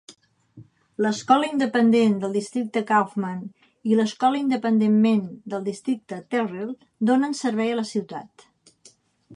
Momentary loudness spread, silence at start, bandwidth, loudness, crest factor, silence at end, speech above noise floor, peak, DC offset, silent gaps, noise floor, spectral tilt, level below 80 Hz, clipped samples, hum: 14 LU; 0.1 s; 11 kHz; -23 LUFS; 18 dB; 0 s; 34 dB; -6 dBFS; under 0.1%; none; -56 dBFS; -6 dB/octave; -74 dBFS; under 0.1%; none